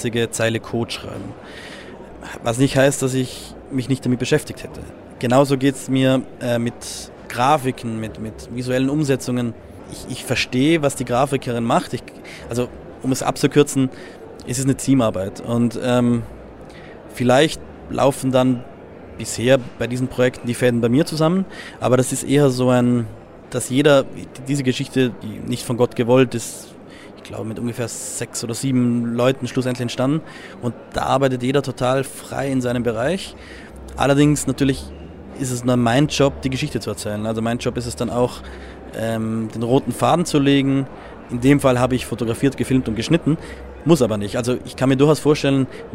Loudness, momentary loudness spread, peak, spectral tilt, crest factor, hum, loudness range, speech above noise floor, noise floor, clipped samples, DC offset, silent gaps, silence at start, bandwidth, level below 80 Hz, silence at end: -20 LUFS; 18 LU; 0 dBFS; -5.5 dB/octave; 20 dB; none; 4 LU; 20 dB; -39 dBFS; under 0.1%; under 0.1%; none; 0 s; 16 kHz; -44 dBFS; 0 s